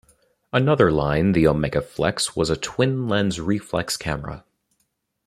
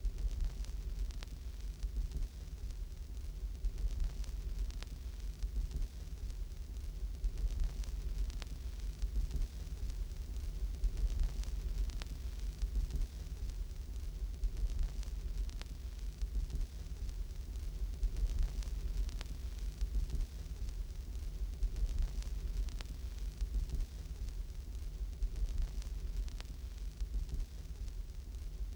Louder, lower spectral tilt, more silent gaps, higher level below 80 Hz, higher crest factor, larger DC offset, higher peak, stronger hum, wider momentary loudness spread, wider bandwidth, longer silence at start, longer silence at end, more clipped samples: first, -21 LUFS vs -44 LUFS; about the same, -5.5 dB/octave vs -5.5 dB/octave; neither; second, -44 dBFS vs -38 dBFS; first, 20 dB vs 14 dB; neither; first, -2 dBFS vs -24 dBFS; neither; about the same, 8 LU vs 6 LU; second, 15 kHz vs 19 kHz; first, 0.55 s vs 0 s; first, 0.9 s vs 0 s; neither